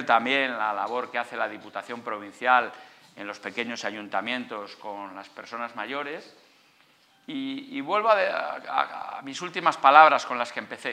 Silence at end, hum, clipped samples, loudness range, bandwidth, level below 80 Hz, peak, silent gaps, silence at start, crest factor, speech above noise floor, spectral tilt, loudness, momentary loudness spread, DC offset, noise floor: 0 s; none; under 0.1%; 12 LU; 11 kHz; -86 dBFS; 0 dBFS; none; 0 s; 26 dB; 35 dB; -3 dB/octave; -25 LUFS; 17 LU; under 0.1%; -61 dBFS